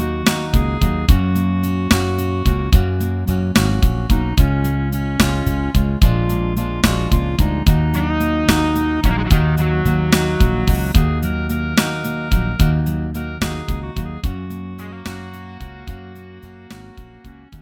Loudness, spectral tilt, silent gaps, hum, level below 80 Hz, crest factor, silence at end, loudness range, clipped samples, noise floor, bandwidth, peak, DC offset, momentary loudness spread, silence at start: -18 LUFS; -6 dB/octave; none; none; -22 dBFS; 16 dB; 0.05 s; 11 LU; under 0.1%; -42 dBFS; 18.5 kHz; 0 dBFS; under 0.1%; 15 LU; 0 s